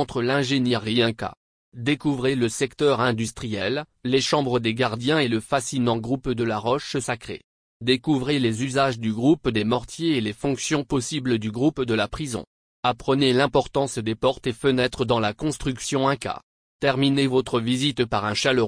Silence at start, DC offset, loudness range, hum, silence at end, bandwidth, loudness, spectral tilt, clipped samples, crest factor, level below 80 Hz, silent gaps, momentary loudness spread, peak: 0 s; under 0.1%; 2 LU; none; 0 s; 10.5 kHz; -23 LUFS; -5 dB/octave; under 0.1%; 18 dB; -50 dBFS; 1.37-1.72 s, 7.44-7.80 s, 12.47-12.83 s, 16.43-16.80 s; 7 LU; -6 dBFS